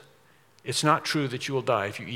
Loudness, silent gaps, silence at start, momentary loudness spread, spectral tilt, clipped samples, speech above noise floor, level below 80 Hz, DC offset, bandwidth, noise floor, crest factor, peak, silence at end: -26 LUFS; none; 0.65 s; 7 LU; -4 dB/octave; under 0.1%; 33 dB; -74 dBFS; under 0.1%; 16.5 kHz; -60 dBFS; 22 dB; -6 dBFS; 0 s